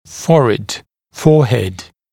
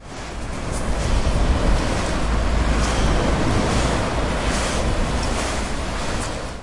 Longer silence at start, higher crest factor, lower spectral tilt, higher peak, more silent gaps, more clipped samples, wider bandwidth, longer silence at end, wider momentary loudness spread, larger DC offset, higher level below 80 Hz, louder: about the same, 0.1 s vs 0 s; about the same, 14 dB vs 14 dB; first, -6.5 dB/octave vs -5 dB/octave; first, 0 dBFS vs -6 dBFS; neither; neither; first, 16 kHz vs 11.5 kHz; first, 0.3 s vs 0 s; first, 15 LU vs 6 LU; neither; second, -46 dBFS vs -24 dBFS; first, -14 LUFS vs -22 LUFS